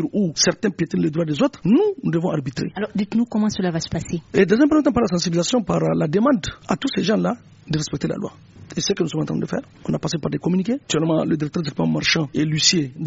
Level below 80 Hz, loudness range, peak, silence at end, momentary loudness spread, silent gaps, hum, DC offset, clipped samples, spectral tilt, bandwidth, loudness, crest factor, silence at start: -50 dBFS; 5 LU; -2 dBFS; 0 s; 9 LU; none; none; under 0.1%; under 0.1%; -5 dB/octave; 8 kHz; -21 LUFS; 18 dB; 0 s